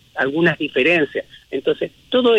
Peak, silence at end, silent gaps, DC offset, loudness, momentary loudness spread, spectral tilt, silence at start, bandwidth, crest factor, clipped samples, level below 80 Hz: -6 dBFS; 0 s; none; under 0.1%; -19 LUFS; 9 LU; -6.5 dB/octave; 0.15 s; 8.6 kHz; 14 dB; under 0.1%; -60 dBFS